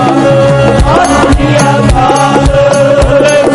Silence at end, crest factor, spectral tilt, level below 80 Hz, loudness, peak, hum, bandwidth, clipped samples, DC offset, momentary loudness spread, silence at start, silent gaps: 0 s; 6 dB; -5.5 dB/octave; -16 dBFS; -6 LUFS; 0 dBFS; none; 11.5 kHz; 0.2%; 0.2%; 1 LU; 0 s; none